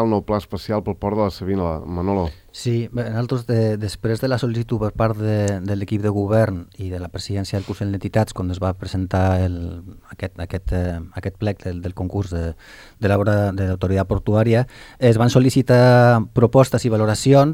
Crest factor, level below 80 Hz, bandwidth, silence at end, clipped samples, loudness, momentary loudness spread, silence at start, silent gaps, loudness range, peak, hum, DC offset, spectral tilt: 18 dB; -40 dBFS; 15 kHz; 0 s; under 0.1%; -20 LUFS; 14 LU; 0 s; none; 9 LU; 0 dBFS; none; under 0.1%; -7 dB/octave